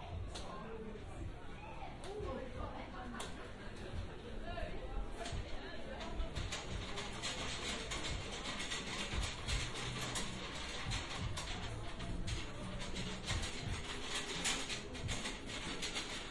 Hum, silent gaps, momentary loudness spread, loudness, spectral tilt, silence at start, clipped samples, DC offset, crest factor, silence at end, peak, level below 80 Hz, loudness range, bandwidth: none; none; 9 LU; -43 LUFS; -3 dB/octave; 0 s; under 0.1%; under 0.1%; 18 dB; 0 s; -24 dBFS; -48 dBFS; 6 LU; 12 kHz